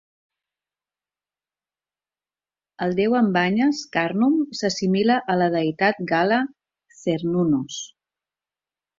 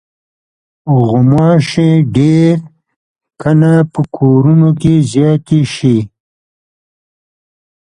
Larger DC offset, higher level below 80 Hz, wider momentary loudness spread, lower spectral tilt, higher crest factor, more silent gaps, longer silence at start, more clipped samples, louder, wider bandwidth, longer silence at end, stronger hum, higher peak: neither; second, -64 dBFS vs -44 dBFS; about the same, 9 LU vs 7 LU; second, -5.5 dB/octave vs -8 dB/octave; first, 18 dB vs 12 dB; second, none vs 2.96-3.15 s; first, 2.8 s vs 0.85 s; neither; second, -21 LUFS vs -10 LUFS; second, 7.6 kHz vs 10 kHz; second, 1.15 s vs 1.85 s; neither; second, -6 dBFS vs 0 dBFS